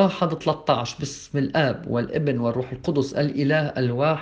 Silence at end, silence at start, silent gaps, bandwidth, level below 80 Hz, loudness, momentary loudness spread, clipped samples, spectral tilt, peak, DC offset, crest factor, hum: 0 s; 0 s; none; 8.6 kHz; -54 dBFS; -24 LUFS; 5 LU; under 0.1%; -6.5 dB/octave; -4 dBFS; under 0.1%; 18 dB; none